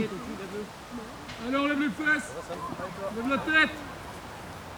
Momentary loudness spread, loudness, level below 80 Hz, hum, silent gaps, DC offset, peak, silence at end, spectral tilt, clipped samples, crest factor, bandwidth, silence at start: 17 LU; -29 LUFS; -56 dBFS; none; none; under 0.1%; -10 dBFS; 0 s; -4.5 dB/octave; under 0.1%; 22 dB; over 20 kHz; 0 s